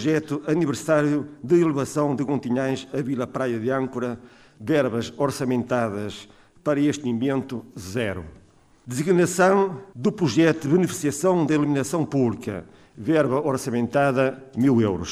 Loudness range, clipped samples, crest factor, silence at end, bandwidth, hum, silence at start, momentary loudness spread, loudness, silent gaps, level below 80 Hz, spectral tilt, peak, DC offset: 5 LU; under 0.1%; 16 dB; 0 s; 15 kHz; none; 0 s; 12 LU; -23 LUFS; none; -58 dBFS; -6 dB/octave; -6 dBFS; under 0.1%